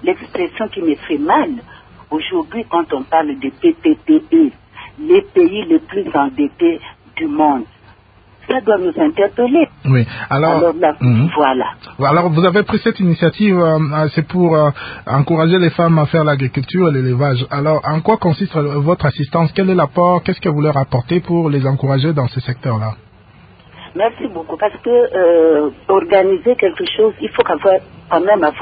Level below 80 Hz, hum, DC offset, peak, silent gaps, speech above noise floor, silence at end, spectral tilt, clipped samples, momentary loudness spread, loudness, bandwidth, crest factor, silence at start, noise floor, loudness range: -46 dBFS; none; under 0.1%; 0 dBFS; none; 33 dB; 0 s; -12.5 dB/octave; under 0.1%; 8 LU; -15 LUFS; 5 kHz; 14 dB; 0 s; -47 dBFS; 4 LU